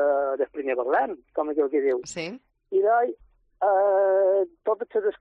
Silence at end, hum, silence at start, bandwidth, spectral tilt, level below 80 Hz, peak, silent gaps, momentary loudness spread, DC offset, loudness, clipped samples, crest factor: 0.05 s; none; 0 s; 9.2 kHz; -4.5 dB/octave; -66 dBFS; -12 dBFS; none; 9 LU; under 0.1%; -24 LUFS; under 0.1%; 12 dB